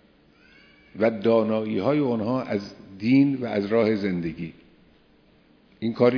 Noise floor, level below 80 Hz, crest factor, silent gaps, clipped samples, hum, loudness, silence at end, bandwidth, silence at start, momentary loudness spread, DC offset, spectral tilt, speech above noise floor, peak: -58 dBFS; -60 dBFS; 20 dB; none; under 0.1%; none; -24 LUFS; 0 s; 5.4 kHz; 0.95 s; 12 LU; under 0.1%; -8.5 dB/octave; 35 dB; -6 dBFS